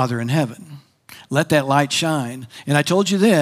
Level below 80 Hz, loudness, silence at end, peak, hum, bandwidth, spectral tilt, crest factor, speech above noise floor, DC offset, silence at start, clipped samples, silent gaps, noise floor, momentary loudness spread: -66 dBFS; -19 LUFS; 0 s; 0 dBFS; none; 16 kHz; -5 dB/octave; 18 dB; 27 dB; under 0.1%; 0 s; under 0.1%; none; -45 dBFS; 12 LU